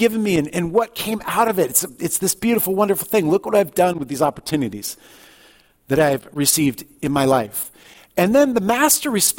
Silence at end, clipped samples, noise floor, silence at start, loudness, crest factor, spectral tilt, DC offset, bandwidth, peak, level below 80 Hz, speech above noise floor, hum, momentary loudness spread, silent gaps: 0 s; under 0.1%; -52 dBFS; 0 s; -19 LUFS; 18 dB; -4 dB/octave; under 0.1%; 17 kHz; -2 dBFS; -52 dBFS; 33 dB; none; 10 LU; none